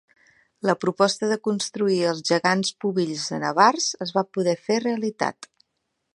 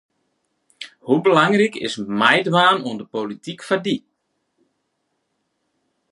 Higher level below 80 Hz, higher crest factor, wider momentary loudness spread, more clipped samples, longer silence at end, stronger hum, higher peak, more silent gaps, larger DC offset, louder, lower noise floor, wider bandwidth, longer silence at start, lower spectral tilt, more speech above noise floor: about the same, -74 dBFS vs -70 dBFS; about the same, 22 dB vs 20 dB; second, 8 LU vs 16 LU; neither; second, 0.7 s vs 2.15 s; neither; about the same, -2 dBFS vs 0 dBFS; neither; neither; second, -23 LUFS vs -18 LUFS; first, -77 dBFS vs -73 dBFS; about the same, 11.5 kHz vs 11.5 kHz; second, 0.65 s vs 0.8 s; about the same, -4 dB/octave vs -5 dB/octave; about the same, 54 dB vs 54 dB